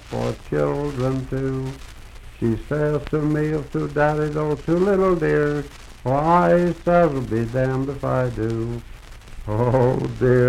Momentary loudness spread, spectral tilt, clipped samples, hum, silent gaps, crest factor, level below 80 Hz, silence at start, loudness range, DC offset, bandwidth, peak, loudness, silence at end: 10 LU; -8 dB/octave; under 0.1%; none; none; 16 dB; -38 dBFS; 0 s; 5 LU; under 0.1%; 13.5 kHz; -4 dBFS; -21 LUFS; 0 s